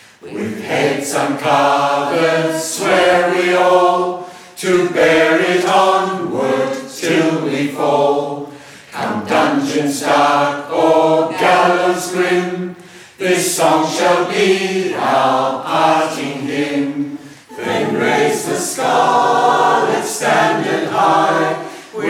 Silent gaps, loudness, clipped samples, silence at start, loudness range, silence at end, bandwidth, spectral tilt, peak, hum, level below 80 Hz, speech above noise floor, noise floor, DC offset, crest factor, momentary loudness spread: none; -15 LUFS; under 0.1%; 0.25 s; 3 LU; 0 s; 17 kHz; -4 dB/octave; -2 dBFS; none; -60 dBFS; 23 dB; -36 dBFS; under 0.1%; 14 dB; 10 LU